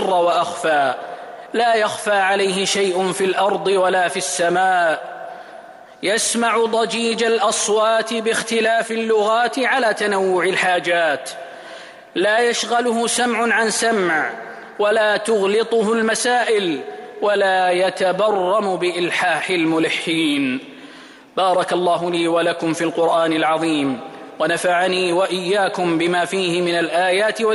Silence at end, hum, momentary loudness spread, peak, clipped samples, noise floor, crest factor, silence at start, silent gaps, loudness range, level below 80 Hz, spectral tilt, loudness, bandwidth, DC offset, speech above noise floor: 0 s; none; 9 LU; -8 dBFS; under 0.1%; -41 dBFS; 12 dB; 0 s; none; 2 LU; -68 dBFS; -3 dB/octave; -18 LUFS; 15 kHz; under 0.1%; 24 dB